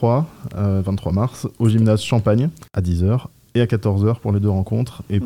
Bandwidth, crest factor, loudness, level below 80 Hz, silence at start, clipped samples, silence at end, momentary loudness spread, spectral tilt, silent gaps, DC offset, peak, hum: 12.5 kHz; 14 dB; -20 LUFS; -44 dBFS; 0 s; under 0.1%; 0 s; 7 LU; -8 dB/octave; none; 0.1%; -4 dBFS; none